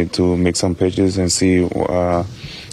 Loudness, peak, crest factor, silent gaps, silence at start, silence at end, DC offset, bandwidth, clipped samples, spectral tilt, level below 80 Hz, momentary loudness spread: -17 LUFS; -4 dBFS; 12 dB; none; 0 s; 0 s; under 0.1%; 13 kHz; under 0.1%; -5 dB/octave; -40 dBFS; 6 LU